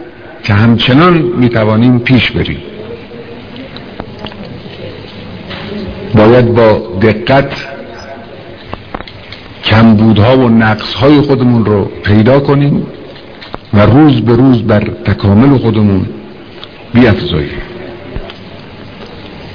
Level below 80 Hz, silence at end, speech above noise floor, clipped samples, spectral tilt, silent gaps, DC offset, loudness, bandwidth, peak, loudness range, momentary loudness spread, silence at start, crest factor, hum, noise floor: -32 dBFS; 0 s; 22 dB; 2%; -9 dB/octave; none; 0.9%; -8 LUFS; 5.4 kHz; 0 dBFS; 7 LU; 22 LU; 0 s; 10 dB; none; -30 dBFS